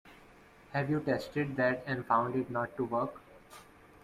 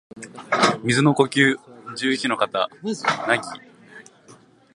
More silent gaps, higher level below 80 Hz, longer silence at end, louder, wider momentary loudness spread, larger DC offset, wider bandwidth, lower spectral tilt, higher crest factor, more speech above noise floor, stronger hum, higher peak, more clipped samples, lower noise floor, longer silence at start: neither; about the same, -66 dBFS vs -66 dBFS; about the same, 0.4 s vs 0.4 s; second, -33 LUFS vs -21 LUFS; first, 23 LU vs 18 LU; neither; first, 15.5 kHz vs 11.5 kHz; first, -7.5 dB/octave vs -4.5 dB/octave; about the same, 18 dB vs 22 dB; second, 25 dB vs 30 dB; neither; second, -16 dBFS vs -2 dBFS; neither; first, -58 dBFS vs -51 dBFS; about the same, 0.05 s vs 0.15 s